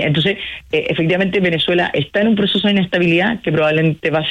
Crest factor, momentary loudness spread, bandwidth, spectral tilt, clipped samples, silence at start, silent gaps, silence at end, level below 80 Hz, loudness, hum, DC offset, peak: 10 dB; 4 LU; 11 kHz; -7 dB/octave; under 0.1%; 0 s; none; 0 s; -48 dBFS; -16 LUFS; none; under 0.1%; -6 dBFS